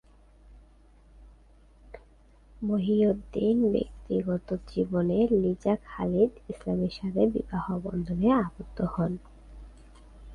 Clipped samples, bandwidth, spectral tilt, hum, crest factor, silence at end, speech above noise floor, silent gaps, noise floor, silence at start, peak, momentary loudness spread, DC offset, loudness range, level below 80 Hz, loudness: under 0.1%; 10 kHz; -9.5 dB/octave; none; 18 dB; 0 s; 30 dB; none; -56 dBFS; 0.5 s; -10 dBFS; 8 LU; under 0.1%; 4 LU; -48 dBFS; -28 LUFS